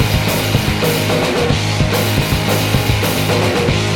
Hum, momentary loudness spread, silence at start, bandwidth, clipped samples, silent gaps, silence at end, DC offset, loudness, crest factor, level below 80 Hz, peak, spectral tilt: none; 1 LU; 0 s; 17.5 kHz; under 0.1%; none; 0 s; under 0.1%; -15 LUFS; 14 dB; -28 dBFS; -2 dBFS; -4.5 dB/octave